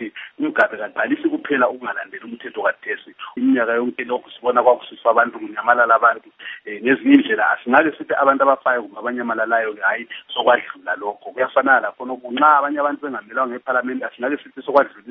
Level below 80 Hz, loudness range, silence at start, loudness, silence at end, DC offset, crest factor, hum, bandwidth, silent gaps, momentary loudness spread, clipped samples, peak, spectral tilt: -72 dBFS; 5 LU; 0 s; -19 LUFS; 0 s; under 0.1%; 20 dB; none; 4.5 kHz; none; 13 LU; under 0.1%; 0 dBFS; -1.5 dB/octave